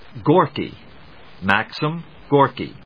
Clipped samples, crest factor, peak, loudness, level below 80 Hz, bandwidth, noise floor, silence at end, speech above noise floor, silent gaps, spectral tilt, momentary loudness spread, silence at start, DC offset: under 0.1%; 20 dB; 0 dBFS; -20 LUFS; -54 dBFS; 5.4 kHz; -45 dBFS; 0.15 s; 26 dB; none; -8 dB/octave; 12 LU; 0.15 s; 0.4%